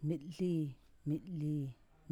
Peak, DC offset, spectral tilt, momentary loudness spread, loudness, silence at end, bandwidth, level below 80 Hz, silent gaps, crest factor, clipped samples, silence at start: -24 dBFS; under 0.1%; -9 dB/octave; 9 LU; -40 LUFS; 0.4 s; 11.5 kHz; -66 dBFS; none; 14 dB; under 0.1%; 0 s